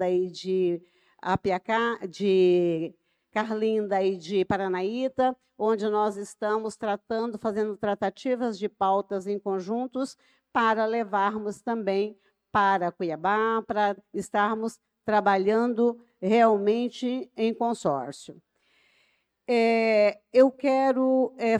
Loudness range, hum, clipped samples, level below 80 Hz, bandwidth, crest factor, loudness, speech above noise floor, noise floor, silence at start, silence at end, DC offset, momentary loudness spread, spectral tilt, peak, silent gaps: 4 LU; none; under 0.1%; -66 dBFS; 11.5 kHz; 18 dB; -26 LUFS; 44 dB; -69 dBFS; 0 s; 0 s; under 0.1%; 10 LU; -6 dB/octave; -8 dBFS; none